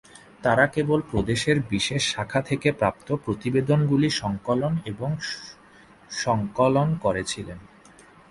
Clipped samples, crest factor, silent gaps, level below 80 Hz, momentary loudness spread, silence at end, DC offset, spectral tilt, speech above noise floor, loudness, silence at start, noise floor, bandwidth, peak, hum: under 0.1%; 18 dB; none; -48 dBFS; 10 LU; 0.65 s; under 0.1%; -5.5 dB/octave; 28 dB; -24 LUFS; 0.4 s; -52 dBFS; 11.5 kHz; -6 dBFS; none